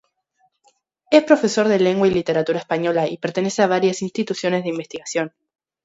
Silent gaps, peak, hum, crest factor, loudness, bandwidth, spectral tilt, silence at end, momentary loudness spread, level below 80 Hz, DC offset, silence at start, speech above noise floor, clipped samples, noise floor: none; 0 dBFS; none; 20 dB; -19 LUFS; 8 kHz; -5 dB/octave; 0.55 s; 9 LU; -58 dBFS; under 0.1%; 1.1 s; 47 dB; under 0.1%; -65 dBFS